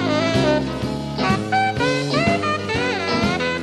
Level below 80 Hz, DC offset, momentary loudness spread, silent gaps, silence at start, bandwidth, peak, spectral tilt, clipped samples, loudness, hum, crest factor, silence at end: -42 dBFS; under 0.1%; 4 LU; none; 0 s; 13 kHz; -4 dBFS; -5.5 dB/octave; under 0.1%; -20 LUFS; none; 16 dB; 0 s